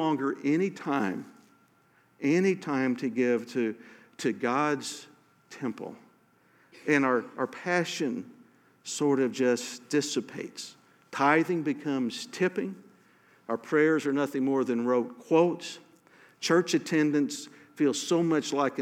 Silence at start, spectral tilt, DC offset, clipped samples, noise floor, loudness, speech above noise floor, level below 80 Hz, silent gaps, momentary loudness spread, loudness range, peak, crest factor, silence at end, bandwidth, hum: 0 s; -5 dB/octave; under 0.1%; under 0.1%; -64 dBFS; -28 LUFS; 37 dB; -88 dBFS; none; 15 LU; 4 LU; -8 dBFS; 20 dB; 0 s; 15.5 kHz; none